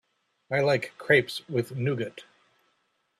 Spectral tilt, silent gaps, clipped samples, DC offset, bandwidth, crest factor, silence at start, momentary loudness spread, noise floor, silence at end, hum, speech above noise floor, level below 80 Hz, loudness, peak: -6 dB/octave; none; under 0.1%; under 0.1%; 14 kHz; 22 dB; 0.5 s; 9 LU; -73 dBFS; 0.95 s; none; 47 dB; -70 dBFS; -27 LUFS; -8 dBFS